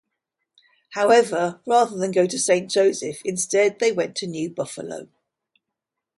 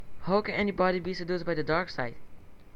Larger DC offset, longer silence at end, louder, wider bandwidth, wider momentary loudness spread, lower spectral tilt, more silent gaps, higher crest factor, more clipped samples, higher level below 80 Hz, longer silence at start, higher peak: neither; first, 1.15 s vs 0 s; first, -21 LUFS vs -30 LUFS; first, 11.5 kHz vs 7.8 kHz; first, 13 LU vs 8 LU; second, -3.5 dB/octave vs -7 dB/octave; neither; about the same, 18 dB vs 18 dB; neither; second, -72 dBFS vs -52 dBFS; first, 0.9 s vs 0 s; first, -4 dBFS vs -12 dBFS